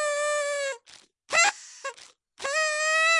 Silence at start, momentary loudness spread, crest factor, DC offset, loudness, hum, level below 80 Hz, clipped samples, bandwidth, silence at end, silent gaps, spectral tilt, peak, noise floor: 0 s; 17 LU; 20 dB; under 0.1%; -25 LUFS; none; -78 dBFS; under 0.1%; 11.5 kHz; 0 s; none; 2.5 dB/octave; -8 dBFS; -55 dBFS